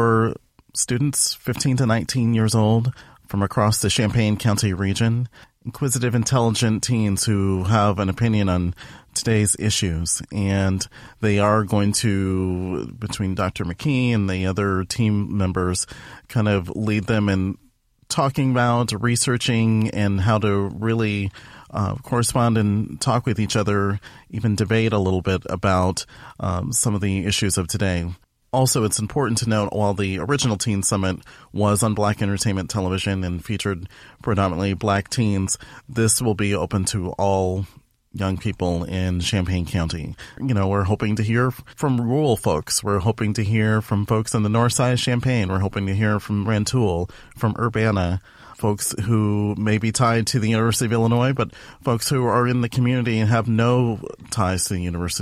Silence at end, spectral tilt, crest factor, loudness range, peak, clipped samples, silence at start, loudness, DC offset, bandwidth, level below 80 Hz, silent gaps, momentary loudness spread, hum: 0 s; -5 dB/octave; 14 dB; 3 LU; -6 dBFS; under 0.1%; 0 s; -21 LUFS; under 0.1%; 15 kHz; -44 dBFS; none; 8 LU; none